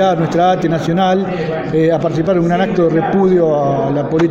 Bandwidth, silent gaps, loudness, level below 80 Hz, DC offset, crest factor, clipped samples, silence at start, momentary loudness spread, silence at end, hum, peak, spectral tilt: 7.8 kHz; none; -14 LUFS; -44 dBFS; under 0.1%; 10 dB; under 0.1%; 0 s; 4 LU; 0 s; none; -2 dBFS; -7.5 dB/octave